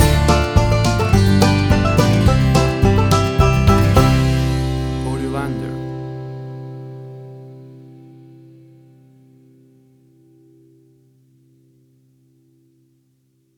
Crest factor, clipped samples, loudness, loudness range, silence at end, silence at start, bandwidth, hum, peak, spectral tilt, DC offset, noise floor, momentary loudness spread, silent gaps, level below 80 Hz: 16 dB; under 0.1%; -16 LUFS; 21 LU; 5.85 s; 0 s; 20 kHz; none; -2 dBFS; -6 dB/octave; under 0.1%; -61 dBFS; 20 LU; none; -26 dBFS